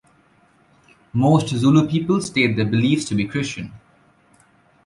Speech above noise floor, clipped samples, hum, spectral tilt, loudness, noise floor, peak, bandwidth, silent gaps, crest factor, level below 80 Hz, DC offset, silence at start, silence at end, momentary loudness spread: 39 dB; under 0.1%; none; -6 dB/octave; -19 LUFS; -57 dBFS; -4 dBFS; 11.5 kHz; none; 16 dB; -52 dBFS; under 0.1%; 1.15 s; 1.1 s; 11 LU